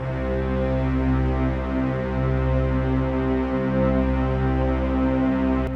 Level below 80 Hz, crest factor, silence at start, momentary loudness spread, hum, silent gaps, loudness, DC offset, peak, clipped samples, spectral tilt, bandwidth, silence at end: -28 dBFS; 12 dB; 0 s; 3 LU; none; none; -23 LUFS; under 0.1%; -10 dBFS; under 0.1%; -9.5 dB/octave; 5.6 kHz; 0 s